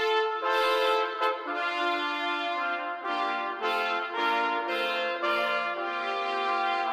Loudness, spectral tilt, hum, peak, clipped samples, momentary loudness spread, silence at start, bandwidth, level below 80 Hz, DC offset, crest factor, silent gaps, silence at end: -28 LUFS; -1.5 dB/octave; none; -10 dBFS; under 0.1%; 5 LU; 0 s; 16.5 kHz; -88 dBFS; under 0.1%; 18 dB; none; 0 s